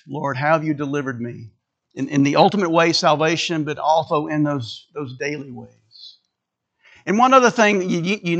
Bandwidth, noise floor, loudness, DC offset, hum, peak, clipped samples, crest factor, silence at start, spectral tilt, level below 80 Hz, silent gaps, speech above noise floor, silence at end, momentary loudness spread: 8.6 kHz; -79 dBFS; -18 LUFS; under 0.1%; none; 0 dBFS; under 0.1%; 20 dB; 0.05 s; -5 dB/octave; -68 dBFS; none; 60 dB; 0 s; 18 LU